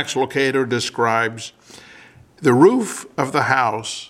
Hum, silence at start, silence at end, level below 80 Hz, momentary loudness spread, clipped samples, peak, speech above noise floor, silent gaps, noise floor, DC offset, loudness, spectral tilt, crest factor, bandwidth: none; 0 s; 0.05 s; -64 dBFS; 11 LU; under 0.1%; 0 dBFS; 27 dB; none; -46 dBFS; under 0.1%; -18 LUFS; -4.5 dB/octave; 18 dB; 14.5 kHz